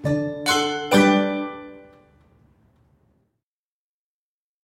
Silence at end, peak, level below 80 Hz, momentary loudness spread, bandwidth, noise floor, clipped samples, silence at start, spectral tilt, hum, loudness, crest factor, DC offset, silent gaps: 2.85 s; -4 dBFS; -58 dBFS; 19 LU; 16 kHz; under -90 dBFS; under 0.1%; 0 s; -4.5 dB/octave; none; -20 LUFS; 20 dB; under 0.1%; none